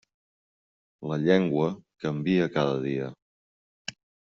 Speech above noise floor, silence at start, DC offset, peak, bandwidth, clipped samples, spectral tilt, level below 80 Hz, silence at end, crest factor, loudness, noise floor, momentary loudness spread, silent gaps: over 64 dB; 1 s; under 0.1%; -6 dBFS; 7.6 kHz; under 0.1%; -6 dB/octave; -66 dBFS; 0.45 s; 22 dB; -27 LUFS; under -90 dBFS; 17 LU; 3.22-3.85 s